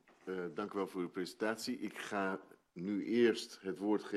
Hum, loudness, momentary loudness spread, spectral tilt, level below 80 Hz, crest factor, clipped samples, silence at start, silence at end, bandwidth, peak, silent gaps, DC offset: none; -38 LUFS; 12 LU; -5 dB/octave; -84 dBFS; 20 dB; under 0.1%; 0.25 s; 0 s; 13 kHz; -18 dBFS; none; under 0.1%